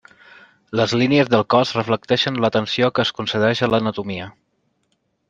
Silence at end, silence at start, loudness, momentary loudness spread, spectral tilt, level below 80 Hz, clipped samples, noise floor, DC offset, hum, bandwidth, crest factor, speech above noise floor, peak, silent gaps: 1 s; 0.7 s; -19 LUFS; 11 LU; -5.5 dB/octave; -58 dBFS; under 0.1%; -69 dBFS; under 0.1%; none; 9.2 kHz; 18 dB; 50 dB; -2 dBFS; none